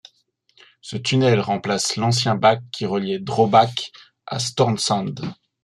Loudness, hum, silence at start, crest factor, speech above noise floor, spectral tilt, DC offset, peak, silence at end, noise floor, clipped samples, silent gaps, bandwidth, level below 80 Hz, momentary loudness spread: -20 LUFS; none; 0.85 s; 20 dB; 43 dB; -4.5 dB/octave; under 0.1%; -2 dBFS; 0.3 s; -63 dBFS; under 0.1%; none; 12.5 kHz; -60 dBFS; 15 LU